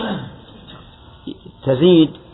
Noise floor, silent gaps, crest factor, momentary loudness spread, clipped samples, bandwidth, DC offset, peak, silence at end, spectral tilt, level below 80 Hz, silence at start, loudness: -42 dBFS; none; 16 dB; 24 LU; under 0.1%; 4.1 kHz; under 0.1%; -2 dBFS; 0.15 s; -10.5 dB/octave; -48 dBFS; 0 s; -16 LUFS